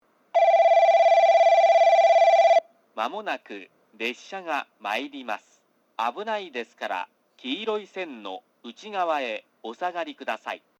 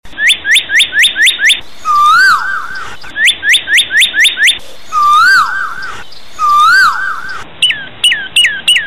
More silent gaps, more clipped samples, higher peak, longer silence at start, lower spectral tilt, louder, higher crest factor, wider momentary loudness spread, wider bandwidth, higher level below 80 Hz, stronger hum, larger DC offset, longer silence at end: neither; neither; second, -10 dBFS vs -2 dBFS; first, 0.35 s vs 0 s; first, -2.5 dB/octave vs 2 dB/octave; second, -22 LUFS vs -8 LUFS; first, 14 dB vs 8 dB; first, 21 LU vs 14 LU; second, 7.8 kHz vs 17 kHz; second, -88 dBFS vs -46 dBFS; neither; second, under 0.1% vs 5%; first, 0.2 s vs 0 s